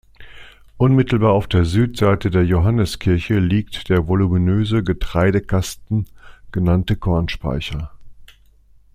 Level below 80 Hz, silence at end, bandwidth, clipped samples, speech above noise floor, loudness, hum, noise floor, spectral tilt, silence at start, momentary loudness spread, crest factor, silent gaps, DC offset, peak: -34 dBFS; 0.7 s; 14.5 kHz; under 0.1%; 33 dB; -18 LUFS; none; -50 dBFS; -7.5 dB/octave; 0.2 s; 8 LU; 16 dB; none; under 0.1%; -2 dBFS